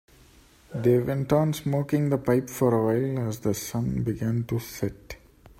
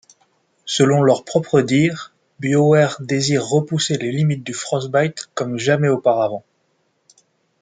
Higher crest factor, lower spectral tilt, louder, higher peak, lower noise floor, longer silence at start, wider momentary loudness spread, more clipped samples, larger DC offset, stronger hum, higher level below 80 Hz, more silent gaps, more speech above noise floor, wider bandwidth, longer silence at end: about the same, 16 dB vs 16 dB; first, -7 dB/octave vs -5.5 dB/octave; second, -26 LUFS vs -18 LUFS; second, -10 dBFS vs -2 dBFS; second, -55 dBFS vs -66 dBFS; about the same, 0.7 s vs 0.65 s; about the same, 10 LU vs 10 LU; neither; neither; neither; first, -52 dBFS vs -62 dBFS; neither; second, 30 dB vs 48 dB; first, 16 kHz vs 9.4 kHz; second, 0.45 s vs 1.2 s